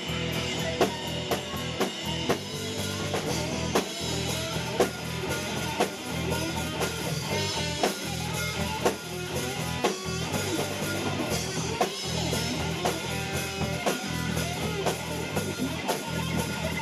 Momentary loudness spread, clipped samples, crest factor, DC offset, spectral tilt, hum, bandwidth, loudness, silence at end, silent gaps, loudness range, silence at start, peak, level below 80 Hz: 3 LU; under 0.1%; 20 dB; under 0.1%; -4 dB/octave; none; 14 kHz; -29 LUFS; 0 s; none; 1 LU; 0 s; -10 dBFS; -48 dBFS